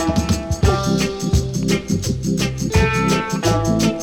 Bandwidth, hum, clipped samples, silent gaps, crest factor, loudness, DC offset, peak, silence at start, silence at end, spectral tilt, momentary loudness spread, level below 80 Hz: 18 kHz; none; under 0.1%; none; 12 dB; -19 LUFS; under 0.1%; -6 dBFS; 0 s; 0 s; -5.5 dB/octave; 4 LU; -28 dBFS